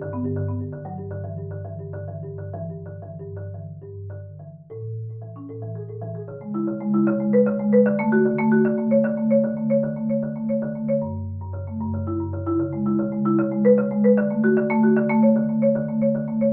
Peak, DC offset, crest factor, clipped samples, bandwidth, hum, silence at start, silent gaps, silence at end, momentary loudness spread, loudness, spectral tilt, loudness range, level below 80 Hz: -6 dBFS; under 0.1%; 16 dB; under 0.1%; 2.9 kHz; none; 0 s; none; 0 s; 17 LU; -22 LUFS; -11.5 dB/octave; 15 LU; -60 dBFS